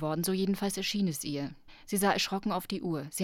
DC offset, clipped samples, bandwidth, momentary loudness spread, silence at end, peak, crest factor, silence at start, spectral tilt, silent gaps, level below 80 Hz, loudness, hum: under 0.1%; under 0.1%; 18 kHz; 7 LU; 0 s; -14 dBFS; 18 dB; 0 s; -4.5 dB/octave; none; -60 dBFS; -31 LUFS; none